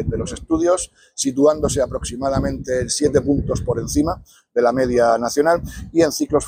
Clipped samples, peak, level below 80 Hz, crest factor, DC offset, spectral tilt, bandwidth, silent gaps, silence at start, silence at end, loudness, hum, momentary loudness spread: under 0.1%; -4 dBFS; -36 dBFS; 16 dB; under 0.1%; -5 dB/octave; 16 kHz; none; 0 s; 0 s; -19 LUFS; none; 7 LU